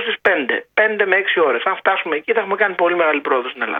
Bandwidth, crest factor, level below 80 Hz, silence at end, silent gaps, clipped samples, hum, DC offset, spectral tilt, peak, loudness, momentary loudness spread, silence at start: 4.9 kHz; 18 dB; -66 dBFS; 0 s; none; under 0.1%; none; under 0.1%; -5.5 dB/octave; 0 dBFS; -17 LUFS; 4 LU; 0 s